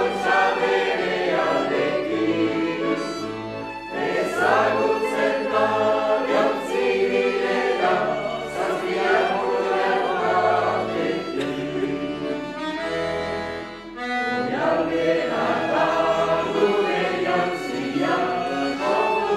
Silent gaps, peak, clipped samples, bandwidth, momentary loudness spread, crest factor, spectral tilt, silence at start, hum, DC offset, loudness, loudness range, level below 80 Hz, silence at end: none; -6 dBFS; under 0.1%; 13.5 kHz; 8 LU; 16 dB; -5 dB/octave; 0 s; none; under 0.1%; -22 LUFS; 4 LU; -54 dBFS; 0 s